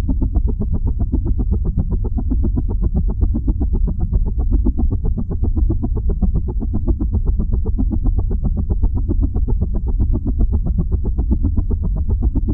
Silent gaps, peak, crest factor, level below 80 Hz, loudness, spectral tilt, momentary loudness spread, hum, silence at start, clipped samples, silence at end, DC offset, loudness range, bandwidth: none; -4 dBFS; 12 dB; -18 dBFS; -21 LUFS; -14.5 dB/octave; 2 LU; none; 0 s; under 0.1%; 0 s; under 0.1%; 0 LU; 1.5 kHz